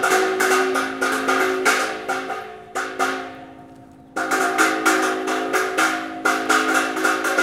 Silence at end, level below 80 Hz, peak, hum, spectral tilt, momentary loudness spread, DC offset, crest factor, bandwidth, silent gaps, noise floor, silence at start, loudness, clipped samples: 0 s; -64 dBFS; -2 dBFS; none; -1.5 dB/octave; 11 LU; under 0.1%; 18 dB; 16.5 kHz; none; -44 dBFS; 0 s; -20 LUFS; under 0.1%